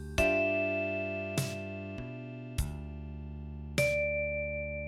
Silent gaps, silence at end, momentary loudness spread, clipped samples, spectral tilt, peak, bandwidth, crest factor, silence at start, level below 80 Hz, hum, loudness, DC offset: none; 0 s; 15 LU; under 0.1%; -5 dB/octave; -14 dBFS; 16 kHz; 20 dB; 0 s; -44 dBFS; none; -33 LUFS; under 0.1%